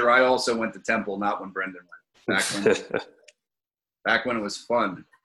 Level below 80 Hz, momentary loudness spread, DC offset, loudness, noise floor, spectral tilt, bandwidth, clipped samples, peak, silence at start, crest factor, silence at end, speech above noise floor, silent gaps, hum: -66 dBFS; 11 LU; under 0.1%; -25 LUFS; under -90 dBFS; -3.5 dB/octave; 13.5 kHz; under 0.1%; -6 dBFS; 0 s; 18 dB; 0.2 s; over 65 dB; none; none